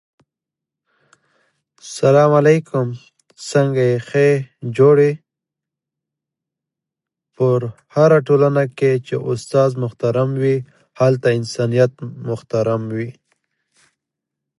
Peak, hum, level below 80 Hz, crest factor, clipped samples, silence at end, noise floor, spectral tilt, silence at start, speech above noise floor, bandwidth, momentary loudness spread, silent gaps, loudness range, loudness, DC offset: 0 dBFS; none; -62 dBFS; 18 dB; under 0.1%; 1.5 s; -85 dBFS; -7 dB/octave; 1.85 s; 69 dB; 11.5 kHz; 14 LU; none; 4 LU; -17 LUFS; under 0.1%